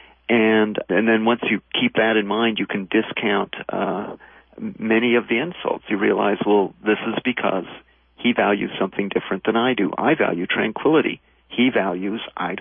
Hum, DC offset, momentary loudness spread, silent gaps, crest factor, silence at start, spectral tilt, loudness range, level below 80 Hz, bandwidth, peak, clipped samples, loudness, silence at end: none; under 0.1%; 9 LU; none; 16 dB; 0.3 s; -10 dB/octave; 3 LU; -62 dBFS; 3.7 kHz; -6 dBFS; under 0.1%; -21 LUFS; 0 s